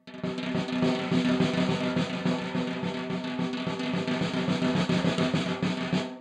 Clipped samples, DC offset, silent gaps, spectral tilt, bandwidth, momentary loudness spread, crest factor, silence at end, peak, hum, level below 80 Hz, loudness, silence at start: under 0.1%; under 0.1%; none; -6 dB/octave; 10 kHz; 6 LU; 16 dB; 0 s; -12 dBFS; none; -62 dBFS; -28 LUFS; 0.05 s